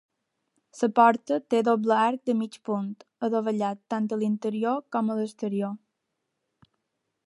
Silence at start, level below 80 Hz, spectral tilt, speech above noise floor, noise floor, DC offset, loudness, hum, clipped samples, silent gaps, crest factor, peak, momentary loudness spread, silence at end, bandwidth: 0.75 s; -80 dBFS; -6.5 dB/octave; 55 dB; -81 dBFS; under 0.1%; -26 LUFS; none; under 0.1%; none; 22 dB; -6 dBFS; 10 LU; 1.5 s; 11 kHz